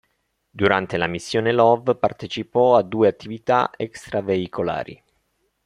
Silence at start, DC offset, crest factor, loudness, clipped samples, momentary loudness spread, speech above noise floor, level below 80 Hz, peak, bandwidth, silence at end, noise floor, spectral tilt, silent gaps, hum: 0.55 s; under 0.1%; 20 dB; -21 LUFS; under 0.1%; 12 LU; 51 dB; -58 dBFS; -2 dBFS; 11.5 kHz; 0.7 s; -71 dBFS; -6 dB/octave; none; none